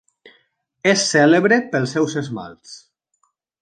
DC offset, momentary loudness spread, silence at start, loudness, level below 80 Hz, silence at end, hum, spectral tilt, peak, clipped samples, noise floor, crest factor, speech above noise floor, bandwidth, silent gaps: under 0.1%; 18 LU; 0.85 s; -17 LUFS; -66 dBFS; 0.85 s; none; -4 dB/octave; -2 dBFS; under 0.1%; -68 dBFS; 18 dB; 50 dB; 9.6 kHz; none